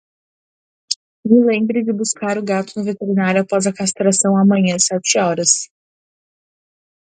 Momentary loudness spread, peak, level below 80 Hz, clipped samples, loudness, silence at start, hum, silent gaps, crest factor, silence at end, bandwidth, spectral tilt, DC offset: 10 LU; 0 dBFS; -64 dBFS; under 0.1%; -16 LUFS; 0.9 s; none; 0.96-1.23 s; 18 dB; 1.55 s; 9.6 kHz; -4 dB/octave; under 0.1%